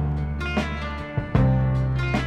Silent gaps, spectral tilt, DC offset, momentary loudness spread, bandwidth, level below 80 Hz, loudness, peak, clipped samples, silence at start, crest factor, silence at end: none; -7.5 dB/octave; under 0.1%; 9 LU; 8.2 kHz; -30 dBFS; -24 LUFS; -8 dBFS; under 0.1%; 0 s; 16 dB; 0 s